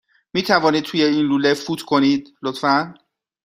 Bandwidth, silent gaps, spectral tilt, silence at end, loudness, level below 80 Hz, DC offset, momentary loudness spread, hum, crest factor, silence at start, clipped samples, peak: 15.5 kHz; none; -5 dB/octave; 0.5 s; -19 LUFS; -60 dBFS; under 0.1%; 8 LU; none; 18 dB; 0.35 s; under 0.1%; 0 dBFS